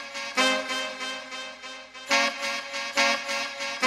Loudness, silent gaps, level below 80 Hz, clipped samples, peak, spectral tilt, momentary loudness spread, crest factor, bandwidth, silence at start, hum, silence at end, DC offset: -26 LUFS; none; -74 dBFS; under 0.1%; -8 dBFS; 0 dB/octave; 14 LU; 20 dB; 16 kHz; 0 s; none; 0 s; under 0.1%